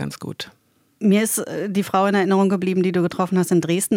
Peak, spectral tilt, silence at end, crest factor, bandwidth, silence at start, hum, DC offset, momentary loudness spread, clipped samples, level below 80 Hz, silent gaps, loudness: -6 dBFS; -5.5 dB/octave; 0 s; 14 dB; 17 kHz; 0 s; none; under 0.1%; 13 LU; under 0.1%; -64 dBFS; none; -20 LUFS